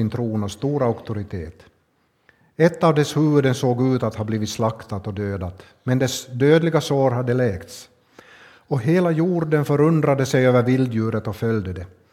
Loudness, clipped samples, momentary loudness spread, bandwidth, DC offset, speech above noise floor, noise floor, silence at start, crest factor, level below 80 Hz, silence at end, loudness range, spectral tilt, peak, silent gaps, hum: -20 LUFS; under 0.1%; 14 LU; 15 kHz; under 0.1%; 45 dB; -65 dBFS; 0 s; 18 dB; -52 dBFS; 0.25 s; 3 LU; -6.5 dB/octave; -2 dBFS; none; none